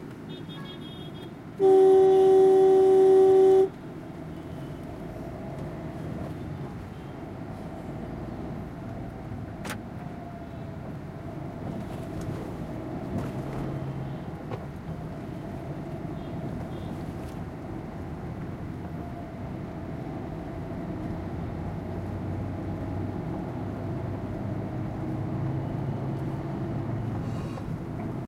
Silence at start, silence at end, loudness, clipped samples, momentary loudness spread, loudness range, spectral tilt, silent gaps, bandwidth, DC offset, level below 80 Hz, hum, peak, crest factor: 0 s; 0 s; -28 LUFS; under 0.1%; 20 LU; 17 LU; -8.5 dB/octave; none; 11 kHz; under 0.1%; -48 dBFS; none; -12 dBFS; 16 dB